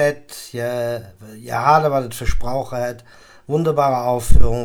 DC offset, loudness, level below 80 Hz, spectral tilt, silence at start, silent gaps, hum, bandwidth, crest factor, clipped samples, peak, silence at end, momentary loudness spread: under 0.1%; -20 LUFS; -26 dBFS; -6 dB/octave; 0 s; none; none; 16.5 kHz; 16 dB; under 0.1%; 0 dBFS; 0 s; 16 LU